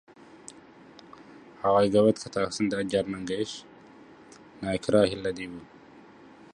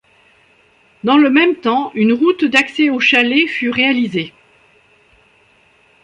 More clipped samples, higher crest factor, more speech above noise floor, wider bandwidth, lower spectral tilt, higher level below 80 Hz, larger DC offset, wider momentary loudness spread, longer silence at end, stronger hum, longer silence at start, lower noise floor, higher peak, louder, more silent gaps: neither; about the same, 20 dB vs 16 dB; second, 25 dB vs 39 dB; about the same, 11 kHz vs 10 kHz; about the same, -5.5 dB/octave vs -4.5 dB/octave; about the same, -58 dBFS vs -62 dBFS; neither; first, 24 LU vs 8 LU; second, 0.55 s vs 1.75 s; neither; first, 1.2 s vs 1.05 s; about the same, -51 dBFS vs -53 dBFS; second, -8 dBFS vs 0 dBFS; second, -27 LUFS vs -13 LUFS; neither